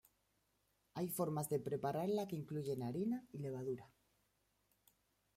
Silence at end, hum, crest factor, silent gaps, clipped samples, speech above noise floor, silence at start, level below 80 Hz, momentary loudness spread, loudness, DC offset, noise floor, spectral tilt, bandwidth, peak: 1.5 s; none; 18 dB; none; under 0.1%; 40 dB; 0.95 s; -78 dBFS; 7 LU; -42 LUFS; under 0.1%; -81 dBFS; -6.5 dB/octave; 16 kHz; -26 dBFS